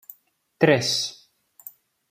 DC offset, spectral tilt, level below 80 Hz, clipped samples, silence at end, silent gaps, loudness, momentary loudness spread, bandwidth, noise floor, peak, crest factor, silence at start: under 0.1%; -4 dB/octave; -68 dBFS; under 0.1%; 0.95 s; none; -21 LUFS; 25 LU; 16 kHz; -56 dBFS; -4 dBFS; 22 dB; 0.6 s